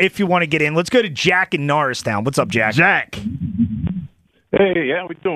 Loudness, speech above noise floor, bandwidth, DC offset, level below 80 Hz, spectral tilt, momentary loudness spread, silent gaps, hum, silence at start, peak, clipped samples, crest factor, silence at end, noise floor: -17 LUFS; 23 dB; 15 kHz; under 0.1%; -44 dBFS; -5.5 dB/octave; 10 LU; none; none; 0 s; -2 dBFS; under 0.1%; 16 dB; 0 s; -41 dBFS